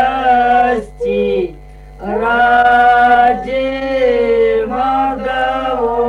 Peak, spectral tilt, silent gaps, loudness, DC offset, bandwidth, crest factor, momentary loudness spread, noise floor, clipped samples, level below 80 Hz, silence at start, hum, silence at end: -2 dBFS; -6 dB/octave; none; -13 LUFS; under 0.1%; 7 kHz; 12 dB; 9 LU; -34 dBFS; under 0.1%; -36 dBFS; 0 s; none; 0 s